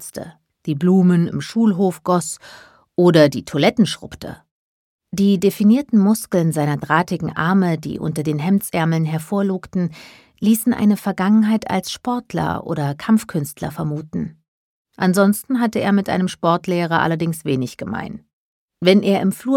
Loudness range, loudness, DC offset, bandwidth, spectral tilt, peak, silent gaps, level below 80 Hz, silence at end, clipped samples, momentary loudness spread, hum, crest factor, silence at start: 3 LU; -18 LUFS; under 0.1%; 17.5 kHz; -6 dB/octave; 0 dBFS; 4.51-4.99 s, 14.48-14.85 s, 18.33-18.68 s; -54 dBFS; 0 s; under 0.1%; 13 LU; none; 18 dB; 0 s